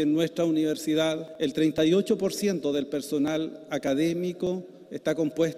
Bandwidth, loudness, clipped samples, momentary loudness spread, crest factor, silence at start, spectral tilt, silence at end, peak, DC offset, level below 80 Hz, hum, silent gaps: 15.5 kHz; -27 LUFS; under 0.1%; 8 LU; 14 dB; 0 s; -5.5 dB/octave; 0 s; -12 dBFS; under 0.1%; -64 dBFS; none; none